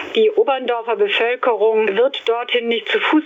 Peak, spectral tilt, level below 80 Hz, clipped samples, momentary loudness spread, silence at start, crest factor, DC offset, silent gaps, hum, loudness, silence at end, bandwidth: -6 dBFS; -4.5 dB/octave; -74 dBFS; under 0.1%; 3 LU; 0 s; 12 dB; under 0.1%; none; none; -17 LUFS; 0 s; 7.4 kHz